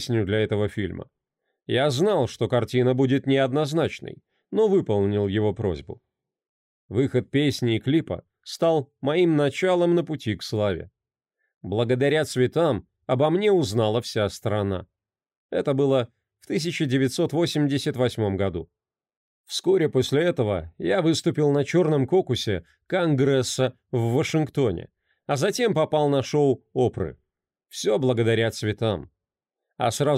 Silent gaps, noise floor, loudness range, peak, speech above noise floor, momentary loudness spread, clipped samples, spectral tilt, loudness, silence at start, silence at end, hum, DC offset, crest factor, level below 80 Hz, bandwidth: 6.49-6.89 s, 11.54-11.61 s, 15.37-15.49 s, 19.17-19.44 s; -87 dBFS; 3 LU; -10 dBFS; 64 dB; 9 LU; under 0.1%; -6 dB/octave; -24 LUFS; 0 s; 0 s; none; under 0.1%; 12 dB; -56 dBFS; 15.5 kHz